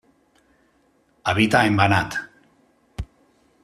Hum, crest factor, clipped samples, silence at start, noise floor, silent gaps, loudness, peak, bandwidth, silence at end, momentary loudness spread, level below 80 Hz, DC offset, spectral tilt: none; 22 dB; under 0.1%; 1.25 s; -62 dBFS; none; -20 LUFS; -2 dBFS; 14 kHz; 0.6 s; 23 LU; -48 dBFS; under 0.1%; -5.5 dB/octave